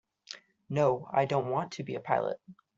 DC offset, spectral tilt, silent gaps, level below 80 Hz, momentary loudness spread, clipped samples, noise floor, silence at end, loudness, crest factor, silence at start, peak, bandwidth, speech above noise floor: under 0.1%; -5.5 dB/octave; none; -72 dBFS; 18 LU; under 0.1%; -51 dBFS; 0.25 s; -31 LUFS; 20 dB; 0.3 s; -12 dBFS; 7.8 kHz; 21 dB